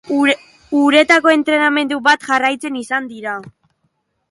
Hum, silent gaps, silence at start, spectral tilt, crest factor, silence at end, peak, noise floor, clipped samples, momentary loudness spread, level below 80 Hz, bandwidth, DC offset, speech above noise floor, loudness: none; none; 0.05 s; -3 dB/octave; 16 dB; 0.8 s; 0 dBFS; -67 dBFS; under 0.1%; 14 LU; -64 dBFS; 11.5 kHz; under 0.1%; 52 dB; -14 LUFS